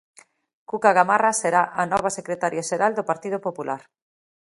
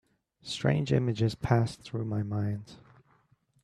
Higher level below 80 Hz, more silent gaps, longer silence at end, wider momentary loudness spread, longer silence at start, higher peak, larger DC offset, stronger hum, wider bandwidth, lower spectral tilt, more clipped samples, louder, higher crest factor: second, -64 dBFS vs -56 dBFS; neither; second, 0.65 s vs 0.9 s; about the same, 12 LU vs 12 LU; first, 0.7 s vs 0.45 s; first, -2 dBFS vs -10 dBFS; neither; neither; about the same, 11.5 kHz vs 11.5 kHz; second, -4 dB/octave vs -7 dB/octave; neither; first, -22 LUFS vs -30 LUFS; about the same, 22 dB vs 22 dB